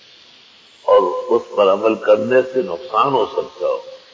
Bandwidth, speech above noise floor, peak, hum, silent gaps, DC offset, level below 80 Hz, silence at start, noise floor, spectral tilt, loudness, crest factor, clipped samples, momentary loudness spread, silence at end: 7.4 kHz; 31 dB; -2 dBFS; none; none; under 0.1%; -64 dBFS; 0.85 s; -47 dBFS; -6 dB/octave; -17 LUFS; 16 dB; under 0.1%; 8 LU; 0.2 s